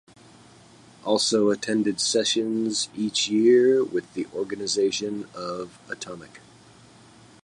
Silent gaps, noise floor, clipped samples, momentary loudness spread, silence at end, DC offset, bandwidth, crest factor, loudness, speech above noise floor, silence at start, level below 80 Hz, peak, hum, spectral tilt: none; -51 dBFS; under 0.1%; 17 LU; 1.05 s; under 0.1%; 11.5 kHz; 16 dB; -23 LUFS; 28 dB; 1.05 s; -68 dBFS; -8 dBFS; none; -3 dB/octave